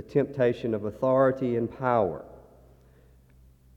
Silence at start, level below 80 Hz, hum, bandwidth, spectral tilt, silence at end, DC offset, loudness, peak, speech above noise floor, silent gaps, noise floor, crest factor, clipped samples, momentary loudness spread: 0 s; -58 dBFS; none; 7.4 kHz; -9 dB/octave; 1.35 s; under 0.1%; -26 LUFS; -10 dBFS; 31 dB; none; -56 dBFS; 18 dB; under 0.1%; 8 LU